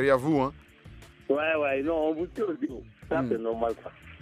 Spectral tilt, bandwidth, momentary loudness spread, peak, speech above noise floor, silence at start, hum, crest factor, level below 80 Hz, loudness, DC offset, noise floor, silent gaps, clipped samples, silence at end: -7 dB/octave; 14 kHz; 13 LU; -8 dBFS; 22 dB; 0 s; none; 20 dB; -54 dBFS; -28 LUFS; under 0.1%; -50 dBFS; none; under 0.1%; 0.05 s